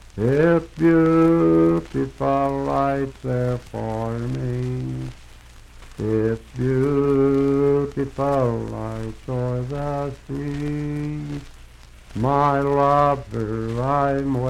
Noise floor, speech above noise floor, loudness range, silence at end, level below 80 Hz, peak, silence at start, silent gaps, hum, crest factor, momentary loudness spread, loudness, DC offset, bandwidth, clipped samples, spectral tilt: -44 dBFS; 23 dB; 8 LU; 0 s; -40 dBFS; -6 dBFS; 0.15 s; none; none; 16 dB; 12 LU; -21 LUFS; under 0.1%; 11.5 kHz; under 0.1%; -8.5 dB/octave